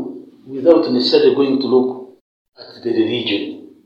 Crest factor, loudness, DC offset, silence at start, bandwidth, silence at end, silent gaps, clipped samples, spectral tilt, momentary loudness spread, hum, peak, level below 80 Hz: 18 dB; -16 LUFS; under 0.1%; 0 s; 7.2 kHz; 0.25 s; 2.21-2.45 s; under 0.1%; -6.5 dB/octave; 18 LU; none; 0 dBFS; -70 dBFS